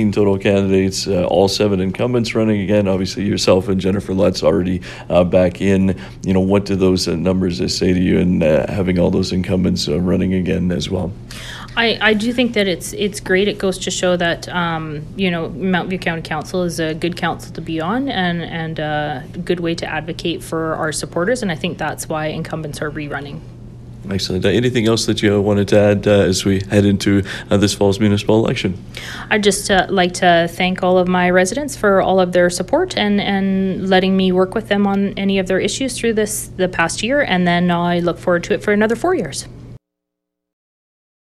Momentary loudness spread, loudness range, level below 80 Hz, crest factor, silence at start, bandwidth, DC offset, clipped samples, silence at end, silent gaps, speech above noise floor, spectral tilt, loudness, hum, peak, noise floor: 9 LU; 6 LU; -40 dBFS; 16 dB; 0 s; 14 kHz; under 0.1%; under 0.1%; 1.5 s; none; 63 dB; -5.5 dB/octave; -17 LUFS; none; 0 dBFS; -79 dBFS